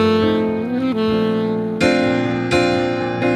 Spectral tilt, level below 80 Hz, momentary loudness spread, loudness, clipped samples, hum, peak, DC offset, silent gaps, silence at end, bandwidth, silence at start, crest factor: -6 dB/octave; -46 dBFS; 4 LU; -18 LUFS; under 0.1%; none; -2 dBFS; under 0.1%; none; 0 s; 12 kHz; 0 s; 14 dB